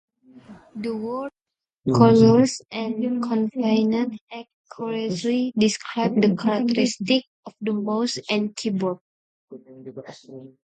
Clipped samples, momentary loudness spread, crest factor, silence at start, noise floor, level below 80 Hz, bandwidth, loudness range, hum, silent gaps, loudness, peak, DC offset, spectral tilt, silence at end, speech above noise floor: under 0.1%; 22 LU; 22 dB; 0.35 s; -81 dBFS; -62 dBFS; 9.2 kHz; 6 LU; none; 4.21-4.27 s, 4.54-4.64 s, 7.27-7.43 s, 9.01-9.48 s; -22 LUFS; 0 dBFS; under 0.1%; -6 dB/octave; 0.15 s; 59 dB